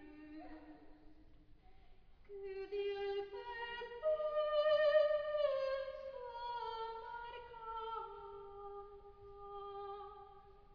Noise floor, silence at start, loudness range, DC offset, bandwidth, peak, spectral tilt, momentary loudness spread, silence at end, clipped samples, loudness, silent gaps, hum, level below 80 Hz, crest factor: -61 dBFS; 0 s; 12 LU; under 0.1%; 5.4 kHz; -22 dBFS; -1 dB/octave; 22 LU; 0 s; under 0.1%; -40 LUFS; none; none; -66 dBFS; 18 dB